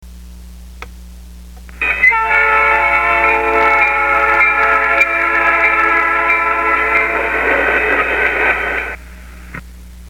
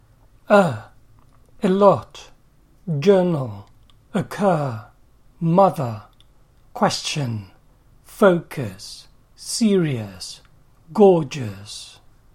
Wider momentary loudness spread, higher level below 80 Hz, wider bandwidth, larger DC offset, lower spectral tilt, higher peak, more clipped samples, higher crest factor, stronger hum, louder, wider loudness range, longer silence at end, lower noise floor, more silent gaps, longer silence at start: second, 8 LU vs 21 LU; first, -34 dBFS vs -54 dBFS; about the same, 17.5 kHz vs 16.5 kHz; first, 0.4% vs under 0.1%; second, -4.5 dB/octave vs -6 dB/octave; about the same, 0 dBFS vs -2 dBFS; neither; second, 14 dB vs 20 dB; neither; first, -12 LUFS vs -20 LUFS; about the same, 3 LU vs 3 LU; second, 0 s vs 0.45 s; second, -34 dBFS vs -54 dBFS; neither; second, 0 s vs 0.5 s